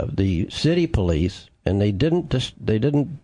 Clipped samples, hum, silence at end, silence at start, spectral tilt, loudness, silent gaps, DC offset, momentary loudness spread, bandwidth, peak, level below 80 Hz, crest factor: under 0.1%; none; 0.05 s; 0 s; -7 dB/octave; -22 LUFS; none; under 0.1%; 5 LU; 10.5 kHz; -6 dBFS; -38 dBFS; 14 dB